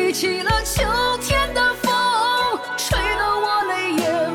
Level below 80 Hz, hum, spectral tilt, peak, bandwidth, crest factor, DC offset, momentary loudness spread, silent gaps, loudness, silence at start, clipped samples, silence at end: -34 dBFS; none; -3 dB/octave; -6 dBFS; 19.5 kHz; 14 dB; under 0.1%; 3 LU; none; -19 LUFS; 0 s; under 0.1%; 0 s